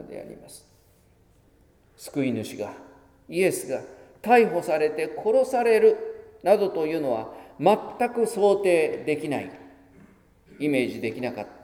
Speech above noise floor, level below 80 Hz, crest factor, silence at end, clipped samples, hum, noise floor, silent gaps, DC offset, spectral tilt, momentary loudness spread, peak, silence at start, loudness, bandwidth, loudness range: 35 dB; -64 dBFS; 20 dB; 0.1 s; under 0.1%; none; -59 dBFS; none; under 0.1%; -5.5 dB/octave; 17 LU; -4 dBFS; 0 s; -24 LUFS; 17 kHz; 8 LU